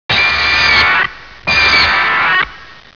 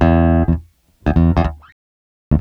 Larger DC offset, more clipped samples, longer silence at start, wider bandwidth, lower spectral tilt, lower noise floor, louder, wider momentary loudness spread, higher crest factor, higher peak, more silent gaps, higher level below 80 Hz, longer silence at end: first, 0.7% vs under 0.1%; neither; about the same, 0.1 s vs 0 s; about the same, 5.4 kHz vs 5.6 kHz; second, -2.5 dB/octave vs -10 dB/octave; about the same, -34 dBFS vs -37 dBFS; first, -10 LUFS vs -17 LUFS; about the same, 9 LU vs 10 LU; about the same, 12 dB vs 16 dB; about the same, 0 dBFS vs 0 dBFS; second, none vs 1.72-2.31 s; second, -34 dBFS vs -24 dBFS; first, 0.25 s vs 0 s